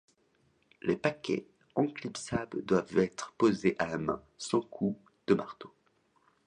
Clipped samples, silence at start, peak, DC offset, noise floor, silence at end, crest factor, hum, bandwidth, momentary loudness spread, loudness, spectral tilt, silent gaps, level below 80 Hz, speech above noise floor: under 0.1%; 0.85 s; -10 dBFS; under 0.1%; -71 dBFS; 0.8 s; 22 dB; none; 11 kHz; 10 LU; -32 LUFS; -6 dB/octave; none; -64 dBFS; 40 dB